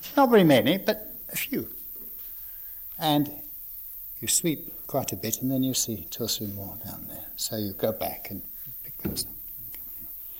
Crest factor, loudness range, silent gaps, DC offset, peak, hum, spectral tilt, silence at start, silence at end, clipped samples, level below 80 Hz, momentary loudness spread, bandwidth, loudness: 20 dB; 6 LU; none; under 0.1%; -8 dBFS; none; -4 dB/octave; 0 s; 0 s; under 0.1%; -56 dBFS; 15 LU; 17.5 kHz; -28 LUFS